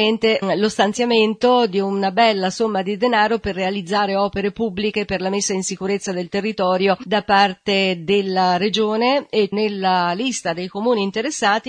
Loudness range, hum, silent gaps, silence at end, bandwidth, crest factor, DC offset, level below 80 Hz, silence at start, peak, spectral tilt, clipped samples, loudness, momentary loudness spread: 3 LU; none; none; 0 s; 10 kHz; 18 dB; under 0.1%; -52 dBFS; 0 s; -2 dBFS; -4 dB/octave; under 0.1%; -19 LUFS; 6 LU